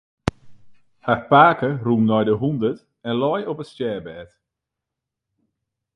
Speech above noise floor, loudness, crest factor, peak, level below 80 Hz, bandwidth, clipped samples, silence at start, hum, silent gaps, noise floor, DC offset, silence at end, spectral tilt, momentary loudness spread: 64 dB; -20 LUFS; 22 dB; 0 dBFS; -50 dBFS; 10 kHz; under 0.1%; 0.25 s; none; none; -84 dBFS; under 0.1%; 1.7 s; -8 dB/octave; 18 LU